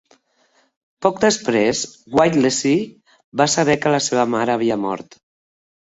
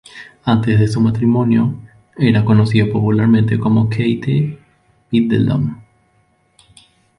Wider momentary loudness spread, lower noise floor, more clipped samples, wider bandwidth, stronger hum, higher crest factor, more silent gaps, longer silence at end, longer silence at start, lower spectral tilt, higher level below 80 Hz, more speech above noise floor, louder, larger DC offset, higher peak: about the same, 9 LU vs 8 LU; about the same, -61 dBFS vs -58 dBFS; neither; second, 8.2 kHz vs 10.5 kHz; neither; first, 20 dB vs 14 dB; first, 3.24-3.32 s vs none; second, 0.95 s vs 1.4 s; first, 1 s vs 0.15 s; second, -4 dB/octave vs -8.5 dB/octave; second, -56 dBFS vs -44 dBFS; about the same, 43 dB vs 45 dB; second, -18 LUFS vs -15 LUFS; neither; about the same, 0 dBFS vs -2 dBFS